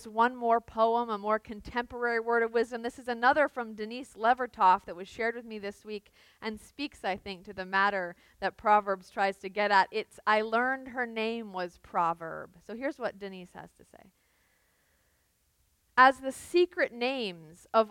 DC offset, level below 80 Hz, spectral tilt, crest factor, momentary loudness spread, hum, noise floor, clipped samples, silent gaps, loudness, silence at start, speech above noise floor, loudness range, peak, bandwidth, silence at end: under 0.1%; -64 dBFS; -4.5 dB/octave; 22 dB; 15 LU; none; -72 dBFS; under 0.1%; none; -29 LUFS; 0 s; 42 dB; 8 LU; -8 dBFS; 16.5 kHz; 0 s